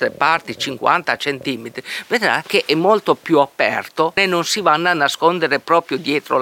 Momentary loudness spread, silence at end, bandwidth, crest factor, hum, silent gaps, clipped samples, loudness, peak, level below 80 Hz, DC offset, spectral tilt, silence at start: 7 LU; 0 s; 17 kHz; 16 dB; none; none; under 0.1%; -17 LUFS; 0 dBFS; -64 dBFS; under 0.1%; -3.5 dB/octave; 0 s